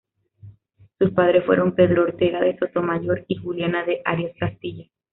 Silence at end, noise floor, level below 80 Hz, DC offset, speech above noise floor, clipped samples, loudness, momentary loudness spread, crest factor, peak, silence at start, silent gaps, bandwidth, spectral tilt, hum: 0.3 s; -55 dBFS; -56 dBFS; under 0.1%; 34 dB; under 0.1%; -21 LUFS; 11 LU; 18 dB; -4 dBFS; 0.45 s; none; 4.1 kHz; -5.5 dB/octave; none